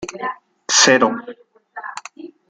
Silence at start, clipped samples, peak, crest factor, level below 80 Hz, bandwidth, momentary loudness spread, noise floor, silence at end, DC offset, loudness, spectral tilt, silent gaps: 0 s; under 0.1%; 0 dBFS; 20 dB; -64 dBFS; 11 kHz; 23 LU; -38 dBFS; 0.2 s; under 0.1%; -14 LUFS; -1 dB/octave; none